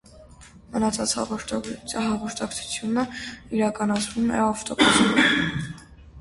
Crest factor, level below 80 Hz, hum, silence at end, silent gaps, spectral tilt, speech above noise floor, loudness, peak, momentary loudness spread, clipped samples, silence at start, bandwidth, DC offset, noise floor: 20 dB; -50 dBFS; none; 0 s; none; -3.5 dB/octave; 24 dB; -23 LUFS; -4 dBFS; 13 LU; under 0.1%; 0.1 s; 11.5 kHz; under 0.1%; -48 dBFS